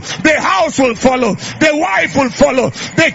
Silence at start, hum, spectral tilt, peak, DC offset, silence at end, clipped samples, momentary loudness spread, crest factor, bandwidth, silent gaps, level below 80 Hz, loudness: 0 s; none; -4 dB/octave; 0 dBFS; under 0.1%; 0 s; under 0.1%; 4 LU; 12 dB; 8 kHz; none; -40 dBFS; -12 LUFS